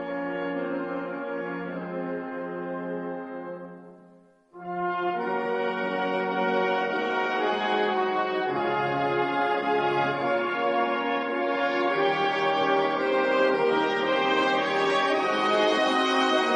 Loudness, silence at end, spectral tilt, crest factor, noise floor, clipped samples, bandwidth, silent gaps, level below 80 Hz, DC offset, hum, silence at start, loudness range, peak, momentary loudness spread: -26 LUFS; 0 s; -5 dB/octave; 16 dB; -56 dBFS; under 0.1%; 10 kHz; none; -70 dBFS; under 0.1%; none; 0 s; 10 LU; -10 dBFS; 10 LU